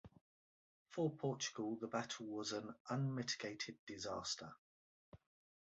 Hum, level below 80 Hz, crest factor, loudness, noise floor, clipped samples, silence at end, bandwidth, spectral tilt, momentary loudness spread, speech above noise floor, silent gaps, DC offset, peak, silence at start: none; -78 dBFS; 20 dB; -44 LUFS; under -90 dBFS; under 0.1%; 0.5 s; 8 kHz; -4.5 dB/octave; 7 LU; over 46 dB; 0.21-0.85 s, 2.80-2.85 s, 3.79-3.87 s, 4.58-5.12 s; under 0.1%; -26 dBFS; 0.05 s